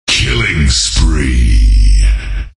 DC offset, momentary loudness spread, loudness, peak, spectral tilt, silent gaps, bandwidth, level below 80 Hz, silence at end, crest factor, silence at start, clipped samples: under 0.1%; 3 LU; -12 LUFS; 0 dBFS; -3.5 dB/octave; none; 11 kHz; -10 dBFS; 0.1 s; 8 dB; 0.05 s; under 0.1%